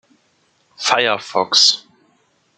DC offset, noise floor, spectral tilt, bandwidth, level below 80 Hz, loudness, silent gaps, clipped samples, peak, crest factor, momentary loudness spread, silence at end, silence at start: under 0.1%; -61 dBFS; 0 dB/octave; 12 kHz; -72 dBFS; -15 LUFS; none; under 0.1%; 0 dBFS; 20 dB; 11 LU; 0.8 s; 0.8 s